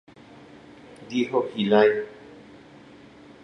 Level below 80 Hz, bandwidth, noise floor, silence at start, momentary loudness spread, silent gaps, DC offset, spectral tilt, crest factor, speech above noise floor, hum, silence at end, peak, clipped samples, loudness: -68 dBFS; 6.6 kHz; -48 dBFS; 0.9 s; 27 LU; none; under 0.1%; -6 dB/octave; 20 dB; 27 dB; none; 1.1 s; -6 dBFS; under 0.1%; -23 LUFS